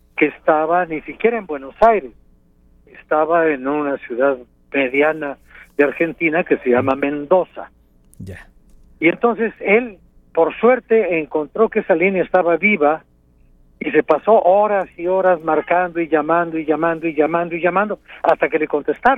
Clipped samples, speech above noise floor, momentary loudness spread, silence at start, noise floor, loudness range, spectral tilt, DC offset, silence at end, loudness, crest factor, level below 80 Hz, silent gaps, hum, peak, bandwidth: under 0.1%; 35 dB; 10 LU; 0.15 s; -52 dBFS; 3 LU; -8 dB/octave; under 0.1%; 0 s; -17 LUFS; 18 dB; -52 dBFS; none; none; 0 dBFS; 4.7 kHz